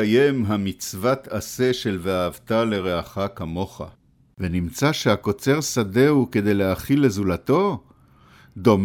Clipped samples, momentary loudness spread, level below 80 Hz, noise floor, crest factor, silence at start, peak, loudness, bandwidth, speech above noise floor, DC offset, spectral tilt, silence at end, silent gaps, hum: under 0.1%; 11 LU; -48 dBFS; -52 dBFS; 18 dB; 0 s; -4 dBFS; -22 LUFS; 18 kHz; 31 dB; under 0.1%; -5.5 dB/octave; 0 s; none; none